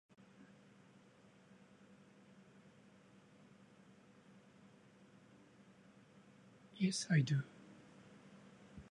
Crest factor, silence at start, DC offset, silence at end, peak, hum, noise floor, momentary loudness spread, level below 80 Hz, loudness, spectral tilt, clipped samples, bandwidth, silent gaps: 24 dB; 6.75 s; under 0.1%; 0.1 s; -22 dBFS; none; -66 dBFS; 26 LU; -80 dBFS; -38 LUFS; -5.5 dB/octave; under 0.1%; 10.5 kHz; none